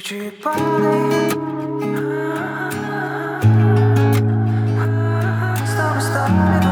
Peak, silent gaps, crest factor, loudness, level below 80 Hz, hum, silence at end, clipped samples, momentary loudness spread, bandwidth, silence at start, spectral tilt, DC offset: -4 dBFS; none; 14 dB; -18 LUFS; -50 dBFS; none; 0 s; under 0.1%; 9 LU; 17.5 kHz; 0 s; -7 dB/octave; under 0.1%